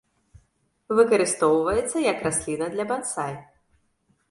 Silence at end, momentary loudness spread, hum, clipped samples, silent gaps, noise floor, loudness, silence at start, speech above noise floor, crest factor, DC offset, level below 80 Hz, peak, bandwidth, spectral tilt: 0.85 s; 10 LU; none; under 0.1%; none; -68 dBFS; -23 LUFS; 0.9 s; 45 dB; 20 dB; under 0.1%; -54 dBFS; -6 dBFS; 11.5 kHz; -4 dB/octave